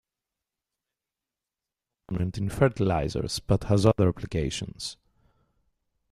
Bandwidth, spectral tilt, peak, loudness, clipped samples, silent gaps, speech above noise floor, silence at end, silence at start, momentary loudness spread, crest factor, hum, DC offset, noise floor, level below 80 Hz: 13.5 kHz; -6.5 dB/octave; -6 dBFS; -27 LUFS; under 0.1%; none; 63 dB; 1.2 s; 2.1 s; 13 LU; 24 dB; none; under 0.1%; -89 dBFS; -46 dBFS